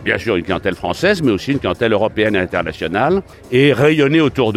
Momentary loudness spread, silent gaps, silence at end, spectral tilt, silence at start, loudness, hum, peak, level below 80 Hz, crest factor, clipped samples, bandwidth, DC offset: 8 LU; none; 0 s; -6.5 dB/octave; 0 s; -16 LUFS; none; -2 dBFS; -42 dBFS; 14 dB; under 0.1%; 15 kHz; under 0.1%